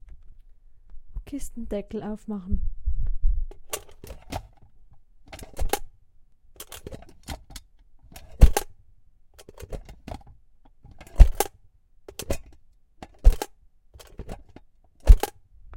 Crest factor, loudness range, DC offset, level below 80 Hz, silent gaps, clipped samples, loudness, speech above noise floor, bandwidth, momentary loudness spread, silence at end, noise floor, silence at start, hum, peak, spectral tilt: 24 dB; 10 LU; under 0.1%; -26 dBFS; none; under 0.1%; -27 LUFS; 27 dB; 17 kHz; 25 LU; 0 s; -55 dBFS; 0.95 s; none; 0 dBFS; -5.5 dB/octave